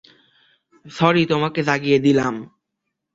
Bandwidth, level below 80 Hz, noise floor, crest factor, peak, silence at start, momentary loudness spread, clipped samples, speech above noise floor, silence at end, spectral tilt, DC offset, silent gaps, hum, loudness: 7.8 kHz; -58 dBFS; -79 dBFS; 20 dB; -2 dBFS; 0.85 s; 12 LU; under 0.1%; 61 dB; 0.7 s; -6.5 dB/octave; under 0.1%; none; none; -18 LUFS